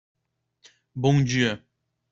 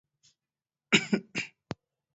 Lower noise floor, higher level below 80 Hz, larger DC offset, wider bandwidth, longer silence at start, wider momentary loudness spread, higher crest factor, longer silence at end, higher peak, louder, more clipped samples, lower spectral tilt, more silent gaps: second, -67 dBFS vs under -90 dBFS; first, -58 dBFS vs -70 dBFS; neither; about the same, 7.6 kHz vs 8 kHz; about the same, 0.95 s vs 0.9 s; about the same, 17 LU vs 19 LU; second, 20 dB vs 28 dB; about the same, 0.55 s vs 0.65 s; about the same, -8 dBFS vs -6 dBFS; first, -23 LUFS vs -29 LUFS; neither; first, -6 dB/octave vs -2.5 dB/octave; neither